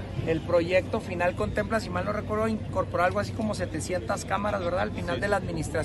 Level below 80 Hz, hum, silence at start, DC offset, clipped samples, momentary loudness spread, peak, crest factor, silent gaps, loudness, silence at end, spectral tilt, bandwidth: -44 dBFS; none; 0 s; under 0.1%; under 0.1%; 5 LU; -10 dBFS; 16 dB; none; -28 LUFS; 0 s; -6 dB/octave; 12.5 kHz